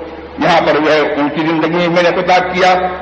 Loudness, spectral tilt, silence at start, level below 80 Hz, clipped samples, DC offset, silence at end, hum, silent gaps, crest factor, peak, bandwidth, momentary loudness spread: -12 LUFS; -5.5 dB/octave; 0 s; -44 dBFS; under 0.1%; under 0.1%; 0 s; none; none; 12 dB; 0 dBFS; 8.6 kHz; 4 LU